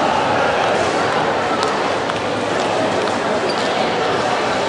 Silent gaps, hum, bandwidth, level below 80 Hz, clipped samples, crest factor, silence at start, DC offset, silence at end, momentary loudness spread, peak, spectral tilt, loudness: none; none; 11.5 kHz; -52 dBFS; under 0.1%; 16 dB; 0 s; under 0.1%; 0 s; 3 LU; -2 dBFS; -4 dB/octave; -18 LUFS